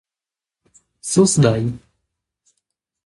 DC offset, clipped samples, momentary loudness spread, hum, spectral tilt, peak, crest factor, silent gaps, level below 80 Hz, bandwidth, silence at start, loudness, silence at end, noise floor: under 0.1%; under 0.1%; 18 LU; none; -5.5 dB/octave; -2 dBFS; 20 dB; none; -52 dBFS; 11.5 kHz; 1.05 s; -17 LUFS; 1.3 s; -89 dBFS